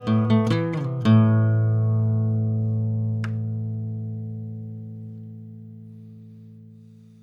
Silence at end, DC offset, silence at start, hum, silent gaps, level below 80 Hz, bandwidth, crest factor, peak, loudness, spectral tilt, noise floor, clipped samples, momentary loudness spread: 0.35 s; under 0.1%; 0 s; none; none; -62 dBFS; 5.2 kHz; 18 dB; -6 dBFS; -23 LUFS; -9.5 dB/octave; -47 dBFS; under 0.1%; 22 LU